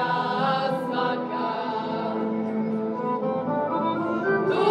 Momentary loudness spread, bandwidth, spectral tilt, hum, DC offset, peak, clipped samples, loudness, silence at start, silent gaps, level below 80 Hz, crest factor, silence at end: 4 LU; 10.5 kHz; -7.5 dB/octave; none; under 0.1%; -10 dBFS; under 0.1%; -26 LUFS; 0 s; none; -70 dBFS; 16 dB; 0 s